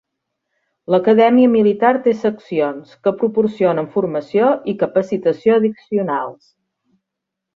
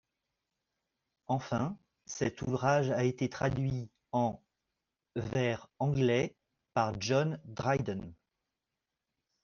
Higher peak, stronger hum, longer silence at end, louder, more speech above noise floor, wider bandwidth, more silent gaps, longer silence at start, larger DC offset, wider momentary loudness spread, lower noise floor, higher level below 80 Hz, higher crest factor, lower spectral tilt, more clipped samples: first, -2 dBFS vs -16 dBFS; neither; about the same, 1.25 s vs 1.3 s; first, -16 LUFS vs -33 LUFS; first, 65 dB vs 57 dB; about the same, 6.8 kHz vs 7.2 kHz; neither; second, 0.9 s vs 1.3 s; neither; about the same, 10 LU vs 11 LU; second, -81 dBFS vs -89 dBFS; about the same, -62 dBFS vs -62 dBFS; second, 14 dB vs 20 dB; first, -8 dB/octave vs -6 dB/octave; neither